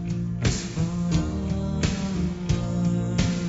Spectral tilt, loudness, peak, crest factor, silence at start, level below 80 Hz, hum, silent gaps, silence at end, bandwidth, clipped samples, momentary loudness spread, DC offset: -6 dB/octave; -26 LUFS; -10 dBFS; 16 dB; 0 s; -36 dBFS; none; none; 0 s; 8 kHz; under 0.1%; 3 LU; under 0.1%